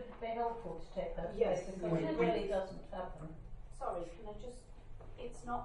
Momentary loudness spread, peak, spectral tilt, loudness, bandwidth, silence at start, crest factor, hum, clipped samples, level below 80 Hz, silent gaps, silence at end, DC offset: 20 LU; -20 dBFS; -6.5 dB/octave; -39 LUFS; 11 kHz; 0 s; 20 dB; none; under 0.1%; -52 dBFS; none; 0 s; under 0.1%